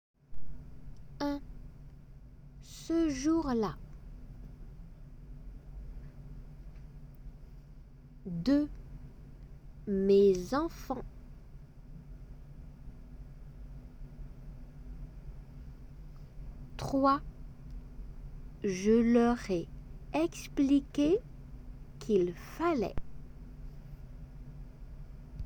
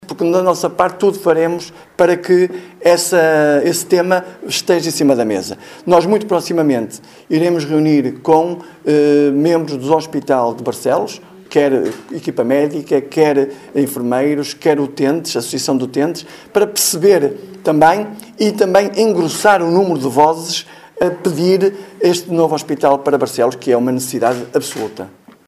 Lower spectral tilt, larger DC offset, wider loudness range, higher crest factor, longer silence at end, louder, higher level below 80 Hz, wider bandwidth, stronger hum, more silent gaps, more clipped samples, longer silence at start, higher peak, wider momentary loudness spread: first, -6.5 dB/octave vs -4.5 dB/octave; neither; first, 20 LU vs 3 LU; first, 20 dB vs 14 dB; second, 0 s vs 0.4 s; second, -31 LUFS vs -15 LUFS; first, -48 dBFS vs -58 dBFS; first, 19 kHz vs 16 kHz; neither; neither; neither; first, 0.3 s vs 0 s; second, -14 dBFS vs 0 dBFS; first, 25 LU vs 8 LU